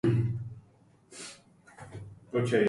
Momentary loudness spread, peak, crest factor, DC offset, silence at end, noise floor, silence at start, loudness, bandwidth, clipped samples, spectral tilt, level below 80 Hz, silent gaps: 23 LU; -14 dBFS; 18 dB; under 0.1%; 0 s; -61 dBFS; 0.05 s; -34 LUFS; 11.5 kHz; under 0.1%; -7 dB/octave; -58 dBFS; none